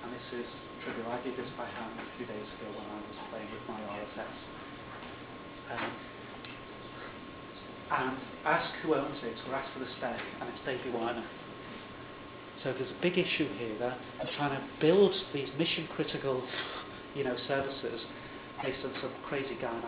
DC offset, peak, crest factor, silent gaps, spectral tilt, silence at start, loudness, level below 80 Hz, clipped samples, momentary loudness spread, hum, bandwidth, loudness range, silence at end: under 0.1%; -14 dBFS; 22 dB; none; -3.5 dB/octave; 0 s; -36 LUFS; -64 dBFS; under 0.1%; 14 LU; none; 4 kHz; 11 LU; 0 s